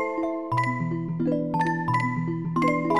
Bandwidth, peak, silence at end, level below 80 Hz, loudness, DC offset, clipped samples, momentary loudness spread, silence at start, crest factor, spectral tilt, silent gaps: 11.5 kHz; -10 dBFS; 0 s; -56 dBFS; -26 LUFS; 0.2%; under 0.1%; 4 LU; 0 s; 14 dB; -8 dB/octave; none